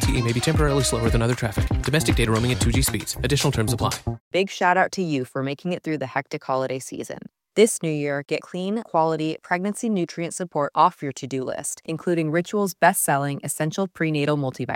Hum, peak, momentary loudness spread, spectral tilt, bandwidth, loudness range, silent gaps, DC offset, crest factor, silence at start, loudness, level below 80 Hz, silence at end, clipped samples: none; -4 dBFS; 9 LU; -5 dB/octave; 16.5 kHz; 3 LU; 4.20-4.31 s; under 0.1%; 20 dB; 0 s; -23 LUFS; -36 dBFS; 0 s; under 0.1%